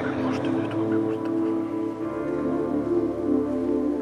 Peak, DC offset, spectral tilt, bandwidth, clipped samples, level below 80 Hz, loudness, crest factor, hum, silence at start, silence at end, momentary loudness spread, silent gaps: -12 dBFS; under 0.1%; -8 dB/octave; 9.8 kHz; under 0.1%; -52 dBFS; -26 LUFS; 14 dB; none; 0 s; 0 s; 4 LU; none